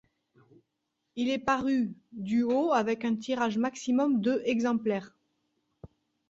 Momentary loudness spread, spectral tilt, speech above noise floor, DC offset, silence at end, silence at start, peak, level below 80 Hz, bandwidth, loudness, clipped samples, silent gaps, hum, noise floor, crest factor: 7 LU; -5.5 dB/octave; 54 dB; under 0.1%; 0.45 s; 1.15 s; -12 dBFS; -68 dBFS; 7.8 kHz; -29 LUFS; under 0.1%; none; none; -82 dBFS; 18 dB